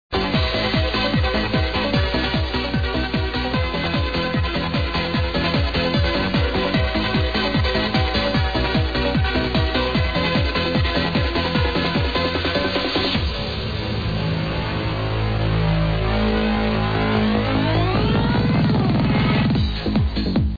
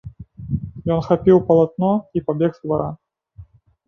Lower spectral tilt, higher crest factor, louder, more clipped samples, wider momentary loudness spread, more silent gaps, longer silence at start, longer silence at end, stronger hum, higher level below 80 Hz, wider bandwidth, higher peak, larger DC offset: second, -7.5 dB/octave vs -10.5 dB/octave; about the same, 14 dB vs 18 dB; about the same, -20 LUFS vs -19 LUFS; neither; second, 4 LU vs 14 LU; neither; about the same, 0.1 s vs 0.05 s; second, 0 s vs 0.45 s; neither; first, -28 dBFS vs -44 dBFS; second, 5 kHz vs 6.2 kHz; second, -6 dBFS vs -2 dBFS; first, 0.5% vs under 0.1%